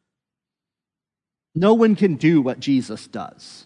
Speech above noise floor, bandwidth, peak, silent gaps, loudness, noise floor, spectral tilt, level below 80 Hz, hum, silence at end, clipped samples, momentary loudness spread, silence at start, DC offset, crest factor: 71 dB; 10.5 kHz; -2 dBFS; none; -18 LUFS; -89 dBFS; -7.5 dB/octave; -64 dBFS; none; 0.4 s; under 0.1%; 18 LU; 1.55 s; under 0.1%; 18 dB